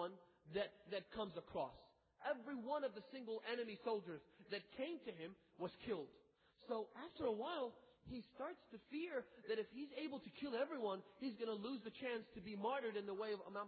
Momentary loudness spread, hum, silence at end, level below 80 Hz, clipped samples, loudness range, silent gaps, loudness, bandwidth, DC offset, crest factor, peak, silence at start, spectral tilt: 10 LU; none; 0 s; -78 dBFS; under 0.1%; 3 LU; none; -48 LUFS; 4.8 kHz; under 0.1%; 16 dB; -30 dBFS; 0 s; -3 dB/octave